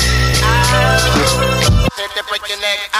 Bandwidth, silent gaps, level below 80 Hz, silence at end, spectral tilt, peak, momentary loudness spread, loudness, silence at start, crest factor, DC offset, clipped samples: 15.5 kHz; none; -20 dBFS; 0 s; -3.5 dB/octave; -2 dBFS; 8 LU; -13 LUFS; 0 s; 12 dB; under 0.1%; under 0.1%